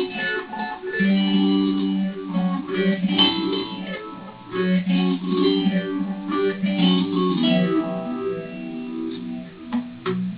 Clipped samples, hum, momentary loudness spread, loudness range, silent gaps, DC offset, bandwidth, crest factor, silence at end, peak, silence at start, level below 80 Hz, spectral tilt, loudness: under 0.1%; none; 12 LU; 2 LU; none; under 0.1%; 4 kHz; 16 dB; 0 s; -6 dBFS; 0 s; -60 dBFS; -10.5 dB/octave; -22 LUFS